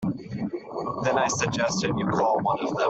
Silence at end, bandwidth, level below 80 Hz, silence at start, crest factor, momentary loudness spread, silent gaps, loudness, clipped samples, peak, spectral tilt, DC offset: 0 s; 8.4 kHz; -56 dBFS; 0 s; 16 dB; 9 LU; none; -26 LUFS; under 0.1%; -8 dBFS; -4.5 dB/octave; under 0.1%